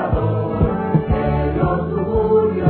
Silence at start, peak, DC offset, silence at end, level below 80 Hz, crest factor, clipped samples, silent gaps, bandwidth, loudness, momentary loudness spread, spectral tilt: 0 s; -2 dBFS; under 0.1%; 0 s; -28 dBFS; 14 dB; under 0.1%; none; 4.4 kHz; -18 LUFS; 4 LU; -13 dB/octave